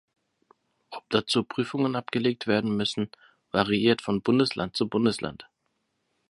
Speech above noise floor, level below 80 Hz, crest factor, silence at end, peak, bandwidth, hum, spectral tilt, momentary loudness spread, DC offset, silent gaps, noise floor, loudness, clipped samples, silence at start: 51 dB; -60 dBFS; 22 dB; 0.85 s; -6 dBFS; 11.5 kHz; none; -5.5 dB/octave; 10 LU; under 0.1%; none; -76 dBFS; -26 LUFS; under 0.1%; 0.9 s